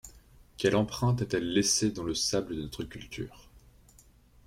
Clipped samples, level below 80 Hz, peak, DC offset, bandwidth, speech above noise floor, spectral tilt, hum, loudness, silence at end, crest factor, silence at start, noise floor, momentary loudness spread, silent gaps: under 0.1%; -54 dBFS; -12 dBFS; under 0.1%; 16 kHz; 29 dB; -4 dB/octave; none; -29 LUFS; 0.85 s; 20 dB; 0.05 s; -59 dBFS; 14 LU; none